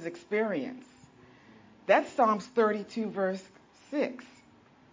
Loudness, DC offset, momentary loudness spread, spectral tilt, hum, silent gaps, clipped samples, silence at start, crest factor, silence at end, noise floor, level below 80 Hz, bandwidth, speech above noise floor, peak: -30 LUFS; under 0.1%; 15 LU; -6 dB/octave; none; none; under 0.1%; 0 s; 22 dB; 0.65 s; -59 dBFS; -76 dBFS; 7.6 kHz; 30 dB; -10 dBFS